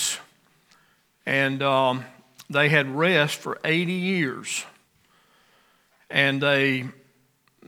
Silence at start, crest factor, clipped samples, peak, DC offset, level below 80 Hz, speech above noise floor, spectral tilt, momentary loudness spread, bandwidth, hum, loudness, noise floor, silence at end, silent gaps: 0 s; 22 dB; under 0.1%; -4 dBFS; under 0.1%; -76 dBFS; 42 dB; -4 dB/octave; 13 LU; 18.5 kHz; none; -23 LUFS; -65 dBFS; 0.75 s; none